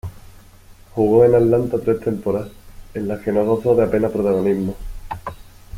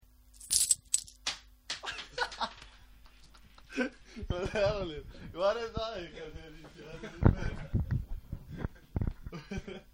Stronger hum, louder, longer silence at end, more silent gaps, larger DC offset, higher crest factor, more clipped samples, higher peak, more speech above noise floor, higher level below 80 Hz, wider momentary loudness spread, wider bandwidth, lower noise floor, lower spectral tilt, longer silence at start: neither; first, -18 LUFS vs -34 LUFS; about the same, 0 s vs 0.1 s; neither; neither; second, 16 dB vs 30 dB; neither; first, -2 dBFS vs -6 dBFS; first, 27 dB vs 23 dB; about the same, -40 dBFS vs -44 dBFS; about the same, 19 LU vs 18 LU; about the same, 15.5 kHz vs 16 kHz; second, -44 dBFS vs -57 dBFS; first, -9 dB/octave vs -3.5 dB/octave; second, 0.05 s vs 0.35 s